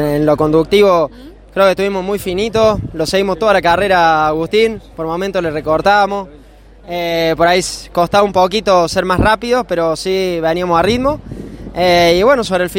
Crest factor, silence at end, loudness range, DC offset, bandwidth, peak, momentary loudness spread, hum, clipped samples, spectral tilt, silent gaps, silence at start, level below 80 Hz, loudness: 14 dB; 0 s; 2 LU; under 0.1%; 16.5 kHz; 0 dBFS; 9 LU; none; under 0.1%; -5 dB/octave; none; 0 s; -34 dBFS; -13 LUFS